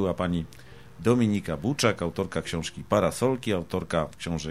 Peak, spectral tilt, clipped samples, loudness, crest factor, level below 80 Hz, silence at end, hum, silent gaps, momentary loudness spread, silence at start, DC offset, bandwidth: -8 dBFS; -5.5 dB/octave; under 0.1%; -27 LUFS; 20 dB; -50 dBFS; 0 s; none; none; 8 LU; 0 s; 0.3%; 15 kHz